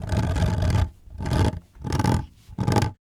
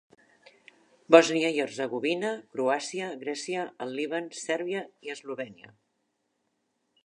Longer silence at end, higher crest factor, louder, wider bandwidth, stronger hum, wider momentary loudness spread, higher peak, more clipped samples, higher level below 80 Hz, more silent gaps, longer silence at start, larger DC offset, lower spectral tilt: second, 0.1 s vs 1.5 s; second, 18 dB vs 28 dB; first, -25 LUFS vs -28 LUFS; first, 15 kHz vs 11 kHz; neither; second, 9 LU vs 18 LU; about the same, -4 dBFS vs -2 dBFS; neither; first, -32 dBFS vs -84 dBFS; neither; second, 0 s vs 1.1 s; neither; first, -6.5 dB/octave vs -3.5 dB/octave